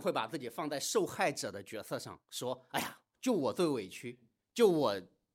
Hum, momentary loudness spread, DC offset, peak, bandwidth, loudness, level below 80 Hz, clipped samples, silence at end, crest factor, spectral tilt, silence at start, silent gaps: none; 14 LU; under 0.1%; -16 dBFS; 16 kHz; -35 LUFS; -82 dBFS; under 0.1%; 0.3 s; 20 dB; -4 dB/octave; 0 s; none